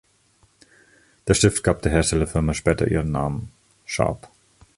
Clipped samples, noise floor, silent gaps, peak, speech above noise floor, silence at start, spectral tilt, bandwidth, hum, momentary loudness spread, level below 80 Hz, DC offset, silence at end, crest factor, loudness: under 0.1%; -60 dBFS; none; -2 dBFS; 40 dB; 1.25 s; -5 dB/octave; 11.5 kHz; none; 15 LU; -36 dBFS; under 0.1%; 0.5 s; 20 dB; -22 LUFS